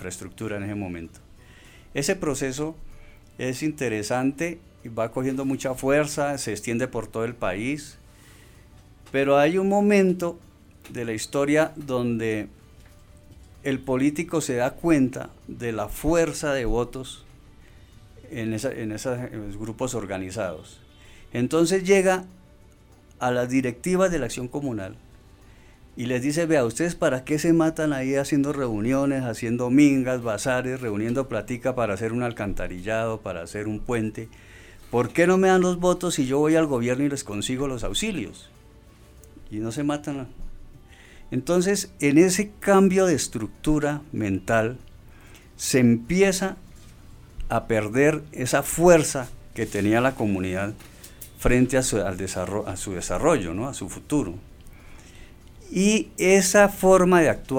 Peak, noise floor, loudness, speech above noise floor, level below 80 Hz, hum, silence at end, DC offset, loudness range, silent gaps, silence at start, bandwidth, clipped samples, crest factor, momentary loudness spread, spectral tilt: -4 dBFS; -52 dBFS; -24 LUFS; 29 dB; -42 dBFS; none; 0 s; under 0.1%; 7 LU; none; 0 s; over 20 kHz; under 0.1%; 22 dB; 15 LU; -5 dB/octave